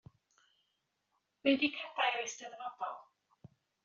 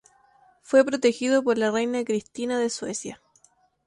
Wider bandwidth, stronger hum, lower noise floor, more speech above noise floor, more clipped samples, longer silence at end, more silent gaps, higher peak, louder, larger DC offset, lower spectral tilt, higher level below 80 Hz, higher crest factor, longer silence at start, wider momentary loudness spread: second, 7.4 kHz vs 11.5 kHz; neither; first, -83 dBFS vs -62 dBFS; first, 47 dB vs 39 dB; neither; about the same, 0.8 s vs 0.7 s; neither; second, -16 dBFS vs -4 dBFS; second, -35 LUFS vs -24 LUFS; neither; second, -0.5 dB/octave vs -3.5 dB/octave; second, -80 dBFS vs -68 dBFS; about the same, 22 dB vs 20 dB; first, 1.45 s vs 0.7 s; first, 14 LU vs 10 LU